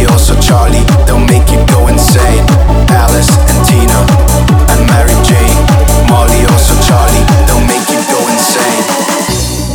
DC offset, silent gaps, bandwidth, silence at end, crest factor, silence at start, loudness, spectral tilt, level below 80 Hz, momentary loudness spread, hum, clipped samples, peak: under 0.1%; none; 19.5 kHz; 0 s; 6 dB; 0 s; -7 LUFS; -5 dB/octave; -10 dBFS; 3 LU; none; 0.3%; 0 dBFS